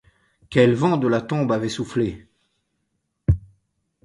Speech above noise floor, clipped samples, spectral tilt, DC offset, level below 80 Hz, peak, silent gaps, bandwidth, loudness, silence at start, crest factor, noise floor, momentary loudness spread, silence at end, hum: 54 dB; under 0.1%; -7 dB/octave; under 0.1%; -38 dBFS; -2 dBFS; none; 11.5 kHz; -22 LUFS; 0.5 s; 20 dB; -74 dBFS; 10 LU; 0.65 s; none